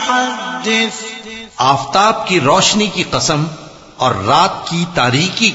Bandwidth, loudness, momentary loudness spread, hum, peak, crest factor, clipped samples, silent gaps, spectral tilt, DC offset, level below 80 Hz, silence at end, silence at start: 8.4 kHz; -14 LUFS; 12 LU; none; 0 dBFS; 14 dB; under 0.1%; none; -3.5 dB/octave; under 0.1%; -46 dBFS; 0 s; 0 s